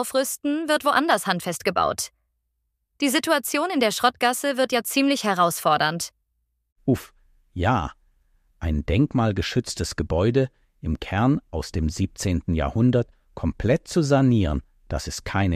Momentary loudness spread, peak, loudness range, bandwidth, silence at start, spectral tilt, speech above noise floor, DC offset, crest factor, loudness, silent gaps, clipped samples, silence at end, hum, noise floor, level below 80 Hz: 10 LU; -4 dBFS; 4 LU; 15.5 kHz; 0 s; -5 dB/octave; 53 dB; under 0.1%; 18 dB; -23 LUFS; 6.72-6.76 s; under 0.1%; 0 s; none; -75 dBFS; -38 dBFS